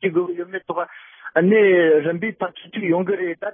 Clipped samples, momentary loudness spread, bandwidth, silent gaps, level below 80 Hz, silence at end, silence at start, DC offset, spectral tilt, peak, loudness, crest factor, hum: under 0.1%; 14 LU; 3.7 kHz; none; -74 dBFS; 0.05 s; 0 s; under 0.1%; -11.5 dB/octave; -2 dBFS; -20 LUFS; 16 dB; none